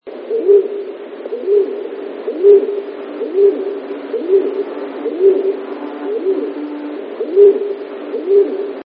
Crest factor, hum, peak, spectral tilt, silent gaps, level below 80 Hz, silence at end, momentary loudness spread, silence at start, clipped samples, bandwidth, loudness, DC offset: 16 dB; none; 0 dBFS; -9.5 dB/octave; none; -80 dBFS; 0.05 s; 15 LU; 0.05 s; under 0.1%; 4.5 kHz; -16 LUFS; under 0.1%